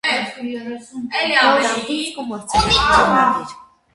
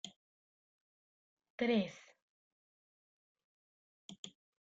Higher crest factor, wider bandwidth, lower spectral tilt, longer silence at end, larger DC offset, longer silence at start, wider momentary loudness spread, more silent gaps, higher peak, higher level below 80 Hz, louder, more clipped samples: about the same, 18 dB vs 22 dB; first, 11.5 kHz vs 9 kHz; second, -3 dB/octave vs -5 dB/octave; about the same, 0.3 s vs 0.4 s; neither; about the same, 0.05 s vs 0.05 s; second, 16 LU vs 24 LU; second, none vs 0.16-1.37 s, 1.50-1.58 s, 2.22-3.35 s, 3.44-4.09 s, 4.19-4.23 s; first, 0 dBFS vs -22 dBFS; first, -38 dBFS vs -82 dBFS; first, -16 LUFS vs -36 LUFS; neither